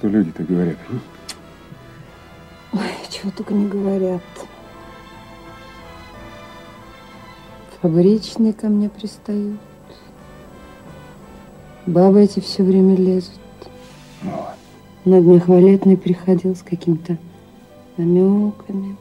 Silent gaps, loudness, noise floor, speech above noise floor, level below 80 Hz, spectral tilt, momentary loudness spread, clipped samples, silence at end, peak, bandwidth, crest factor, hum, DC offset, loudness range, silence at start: none; -17 LUFS; -43 dBFS; 28 dB; -52 dBFS; -8.5 dB/octave; 27 LU; under 0.1%; 0.05 s; 0 dBFS; 10.5 kHz; 18 dB; none; under 0.1%; 12 LU; 0.05 s